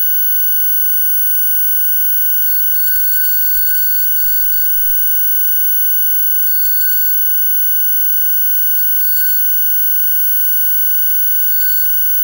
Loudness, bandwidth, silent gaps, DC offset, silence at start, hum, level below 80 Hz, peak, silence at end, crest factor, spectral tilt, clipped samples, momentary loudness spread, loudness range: -9 LUFS; 16.5 kHz; none; under 0.1%; 0 s; 50 Hz at -55 dBFS; -50 dBFS; -4 dBFS; 0 s; 8 dB; 3 dB/octave; under 0.1%; 0 LU; 0 LU